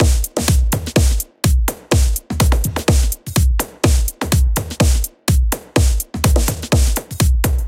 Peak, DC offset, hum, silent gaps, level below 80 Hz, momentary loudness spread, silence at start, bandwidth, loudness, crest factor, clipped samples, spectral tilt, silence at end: 0 dBFS; under 0.1%; none; none; -18 dBFS; 3 LU; 0 s; 17 kHz; -17 LUFS; 16 dB; under 0.1%; -5 dB/octave; 0 s